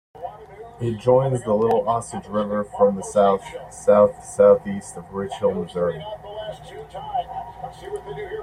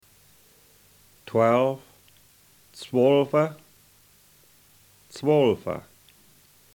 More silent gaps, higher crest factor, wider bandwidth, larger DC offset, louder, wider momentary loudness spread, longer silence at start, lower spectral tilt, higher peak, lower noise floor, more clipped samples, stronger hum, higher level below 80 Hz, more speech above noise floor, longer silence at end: neither; about the same, 18 dB vs 20 dB; second, 11 kHz vs 19.5 kHz; neither; about the same, -21 LUFS vs -23 LUFS; first, 20 LU vs 17 LU; second, 0.15 s vs 1.35 s; about the same, -6.5 dB/octave vs -7 dB/octave; first, -2 dBFS vs -8 dBFS; second, -41 dBFS vs -58 dBFS; neither; neither; first, -52 dBFS vs -66 dBFS; second, 20 dB vs 36 dB; second, 0 s vs 0.95 s